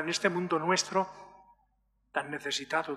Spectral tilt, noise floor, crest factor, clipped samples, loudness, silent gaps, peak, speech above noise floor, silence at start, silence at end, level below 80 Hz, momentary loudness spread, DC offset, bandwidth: -3 dB/octave; -73 dBFS; 20 dB; under 0.1%; -31 LUFS; none; -12 dBFS; 42 dB; 0 s; 0 s; -74 dBFS; 9 LU; under 0.1%; 14 kHz